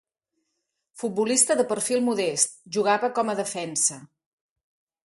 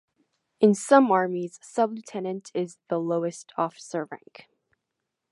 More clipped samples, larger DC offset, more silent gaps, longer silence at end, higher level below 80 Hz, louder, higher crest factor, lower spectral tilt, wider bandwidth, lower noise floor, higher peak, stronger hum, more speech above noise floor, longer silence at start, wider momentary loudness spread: neither; neither; neither; second, 1 s vs 1.15 s; first, -74 dBFS vs -84 dBFS; about the same, -24 LUFS vs -25 LUFS; about the same, 20 dB vs 22 dB; second, -2.5 dB/octave vs -6 dB/octave; about the same, 12 kHz vs 11.5 kHz; second, -79 dBFS vs -83 dBFS; about the same, -6 dBFS vs -4 dBFS; neither; about the same, 55 dB vs 58 dB; first, 0.95 s vs 0.6 s; second, 8 LU vs 15 LU